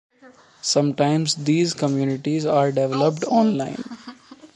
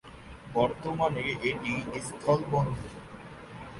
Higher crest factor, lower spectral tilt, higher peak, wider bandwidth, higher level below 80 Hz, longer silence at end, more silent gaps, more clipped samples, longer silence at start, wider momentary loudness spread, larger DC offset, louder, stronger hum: about the same, 18 dB vs 20 dB; about the same, -5.5 dB/octave vs -6 dB/octave; first, -4 dBFS vs -10 dBFS; about the same, 11.5 kHz vs 11.5 kHz; second, -68 dBFS vs -52 dBFS; about the same, 0.1 s vs 0 s; neither; neither; first, 0.25 s vs 0.05 s; second, 12 LU vs 18 LU; neither; first, -21 LUFS vs -30 LUFS; neither